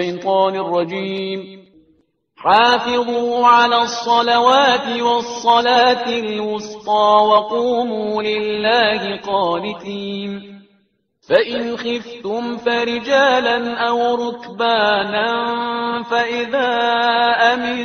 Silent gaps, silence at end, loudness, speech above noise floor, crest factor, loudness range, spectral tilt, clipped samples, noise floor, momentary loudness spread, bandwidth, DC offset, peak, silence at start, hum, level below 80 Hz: none; 0 s; -16 LUFS; 45 dB; 16 dB; 6 LU; -3.5 dB/octave; under 0.1%; -61 dBFS; 12 LU; 6.8 kHz; under 0.1%; 0 dBFS; 0 s; none; -60 dBFS